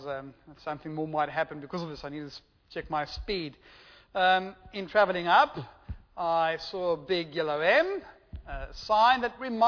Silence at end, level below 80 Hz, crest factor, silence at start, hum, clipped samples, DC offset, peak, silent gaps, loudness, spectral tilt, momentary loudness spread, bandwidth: 0 s; -52 dBFS; 20 dB; 0 s; none; under 0.1%; under 0.1%; -10 dBFS; none; -28 LUFS; -5.5 dB/octave; 19 LU; 5.4 kHz